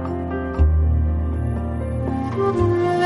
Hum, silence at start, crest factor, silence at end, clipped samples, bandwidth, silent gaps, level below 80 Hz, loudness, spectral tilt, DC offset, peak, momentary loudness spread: none; 0 s; 14 dB; 0 s; under 0.1%; 5.6 kHz; none; -24 dBFS; -21 LUFS; -9 dB/octave; under 0.1%; -6 dBFS; 7 LU